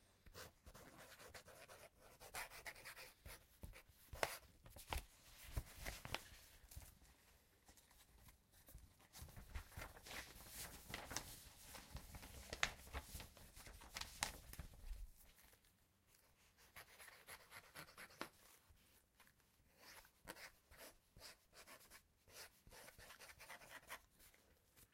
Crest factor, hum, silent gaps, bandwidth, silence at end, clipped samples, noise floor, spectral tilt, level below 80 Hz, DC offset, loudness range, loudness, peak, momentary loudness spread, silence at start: 40 dB; none; none; 16.5 kHz; 0.05 s; under 0.1%; -77 dBFS; -2.5 dB/octave; -64 dBFS; under 0.1%; 11 LU; -55 LUFS; -18 dBFS; 19 LU; 0 s